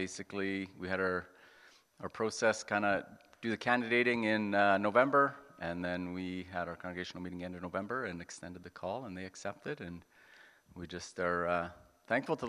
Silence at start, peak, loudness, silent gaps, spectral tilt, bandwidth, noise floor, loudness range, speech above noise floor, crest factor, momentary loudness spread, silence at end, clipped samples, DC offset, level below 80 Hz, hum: 0 s; -12 dBFS; -35 LUFS; none; -5 dB/octave; 12.5 kHz; -62 dBFS; 11 LU; 28 dB; 22 dB; 16 LU; 0 s; under 0.1%; under 0.1%; -70 dBFS; none